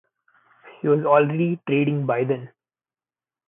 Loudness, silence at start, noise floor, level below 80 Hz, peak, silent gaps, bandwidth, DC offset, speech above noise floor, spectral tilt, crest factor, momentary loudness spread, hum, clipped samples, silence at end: -21 LUFS; 0.65 s; under -90 dBFS; -76 dBFS; -4 dBFS; none; 3.8 kHz; under 0.1%; over 70 dB; -12 dB/octave; 20 dB; 9 LU; none; under 0.1%; 1 s